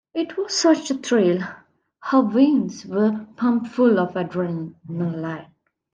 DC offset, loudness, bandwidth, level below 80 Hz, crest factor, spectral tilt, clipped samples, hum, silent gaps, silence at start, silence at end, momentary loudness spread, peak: under 0.1%; -21 LUFS; 9.4 kHz; -72 dBFS; 18 dB; -5.5 dB/octave; under 0.1%; none; none; 0.15 s; 0.5 s; 13 LU; -4 dBFS